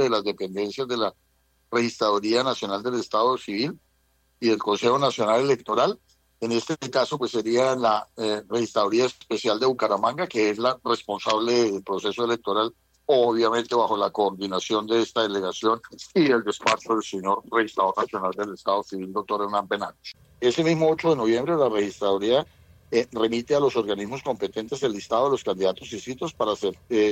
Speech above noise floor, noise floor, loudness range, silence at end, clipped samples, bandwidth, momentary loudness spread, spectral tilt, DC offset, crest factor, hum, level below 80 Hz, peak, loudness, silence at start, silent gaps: 42 dB; -66 dBFS; 2 LU; 0 s; under 0.1%; 15 kHz; 8 LU; -4.5 dB/octave; under 0.1%; 16 dB; none; -64 dBFS; -8 dBFS; -24 LUFS; 0 s; none